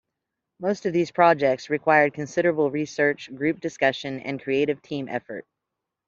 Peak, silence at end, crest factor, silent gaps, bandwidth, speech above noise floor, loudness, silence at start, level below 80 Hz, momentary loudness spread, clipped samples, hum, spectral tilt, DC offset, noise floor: -4 dBFS; 0.65 s; 20 dB; none; 7.6 kHz; 61 dB; -24 LUFS; 0.6 s; -68 dBFS; 12 LU; under 0.1%; none; -5.5 dB/octave; under 0.1%; -84 dBFS